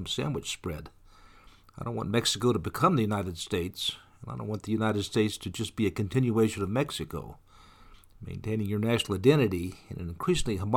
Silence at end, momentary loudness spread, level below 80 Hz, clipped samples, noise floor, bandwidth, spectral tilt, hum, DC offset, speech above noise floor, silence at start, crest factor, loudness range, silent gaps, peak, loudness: 0 s; 14 LU; -50 dBFS; under 0.1%; -55 dBFS; 18.5 kHz; -5.5 dB/octave; none; under 0.1%; 26 dB; 0 s; 22 dB; 2 LU; none; -8 dBFS; -29 LUFS